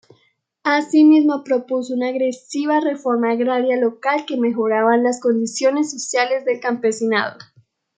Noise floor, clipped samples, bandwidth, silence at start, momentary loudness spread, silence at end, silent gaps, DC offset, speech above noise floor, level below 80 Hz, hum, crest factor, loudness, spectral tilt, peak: -63 dBFS; under 0.1%; 9.4 kHz; 0.65 s; 8 LU; 0.55 s; none; under 0.1%; 45 dB; -76 dBFS; none; 16 dB; -18 LUFS; -4 dB/octave; -2 dBFS